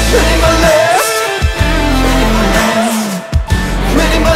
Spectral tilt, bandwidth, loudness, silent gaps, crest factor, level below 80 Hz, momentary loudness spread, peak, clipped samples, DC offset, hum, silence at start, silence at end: -4.5 dB/octave; 16.5 kHz; -11 LUFS; none; 10 dB; -16 dBFS; 6 LU; 0 dBFS; under 0.1%; under 0.1%; none; 0 s; 0 s